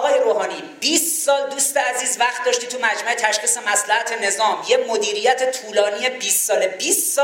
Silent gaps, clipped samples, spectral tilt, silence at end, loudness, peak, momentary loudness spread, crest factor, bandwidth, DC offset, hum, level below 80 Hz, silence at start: none; under 0.1%; 0.5 dB/octave; 0 s; -18 LUFS; -2 dBFS; 4 LU; 18 dB; 17 kHz; under 0.1%; none; -76 dBFS; 0 s